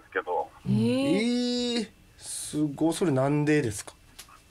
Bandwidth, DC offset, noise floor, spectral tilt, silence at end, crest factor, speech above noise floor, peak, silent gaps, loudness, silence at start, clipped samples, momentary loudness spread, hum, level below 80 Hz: 15.5 kHz; under 0.1%; -51 dBFS; -5.5 dB/octave; 0.25 s; 14 dB; 26 dB; -14 dBFS; none; -27 LUFS; 0.1 s; under 0.1%; 12 LU; none; -60 dBFS